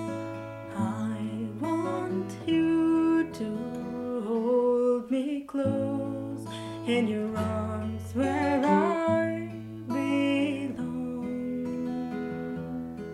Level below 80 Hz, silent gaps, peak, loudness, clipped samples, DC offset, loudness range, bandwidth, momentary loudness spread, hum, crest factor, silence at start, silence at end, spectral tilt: -60 dBFS; none; -10 dBFS; -29 LUFS; under 0.1%; under 0.1%; 3 LU; 12.5 kHz; 11 LU; none; 18 dB; 0 s; 0 s; -7 dB/octave